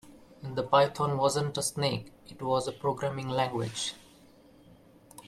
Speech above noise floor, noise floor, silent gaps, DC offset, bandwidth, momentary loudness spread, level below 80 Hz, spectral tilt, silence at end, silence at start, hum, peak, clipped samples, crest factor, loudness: 28 dB; -57 dBFS; none; under 0.1%; 14.5 kHz; 13 LU; -64 dBFS; -4.5 dB/octave; 0 s; 0.05 s; none; -10 dBFS; under 0.1%; 22 dB; -30 LUFS